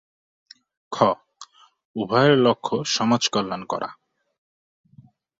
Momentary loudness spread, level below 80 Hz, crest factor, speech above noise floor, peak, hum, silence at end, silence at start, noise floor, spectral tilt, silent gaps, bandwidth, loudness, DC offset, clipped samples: 16 LU; -64 dBFS; 20 dB; 32 dB; -4 dBFS; none; 1.45 s; 0.9 s; -53 dBFS; -4.5 dB/octave; 1.85-1.94 s; 7.8 kHz; -21 LUFS; under 0.1%; under 0.1%